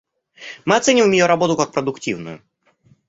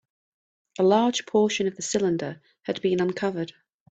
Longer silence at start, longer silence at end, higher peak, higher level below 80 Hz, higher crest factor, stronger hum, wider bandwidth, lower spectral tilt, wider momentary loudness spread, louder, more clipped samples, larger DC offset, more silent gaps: second, 0.4 s vs 0.8 s; first, 0.7 s vs 0.45 s; first, 0 dBFS vs -6 dBFS; first, -60 dBFS vs -68 dBFS; about the same, 18 dB vs 18 dB; neither; about the same, 8.2 kHz vs 9 kHz; about the same, -4 dB/octave vs -4.5 dB/octave; first, 21 LU vs 15 LU; first, -17 LUFS vs -25 LUFS; neither; neither; neither